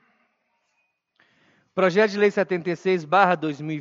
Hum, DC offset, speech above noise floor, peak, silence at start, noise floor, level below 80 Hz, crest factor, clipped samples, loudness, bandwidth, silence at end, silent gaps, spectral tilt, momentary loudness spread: none; under 0.1%; 51 dB; -2 dBFS; 1.75 s; -73 dBFS; -80 dBFS; 22 dB; under 0.1%; -22 LUFS; 7.6 kHz; 0 s; none; -6.5 dB/octave; 7 LU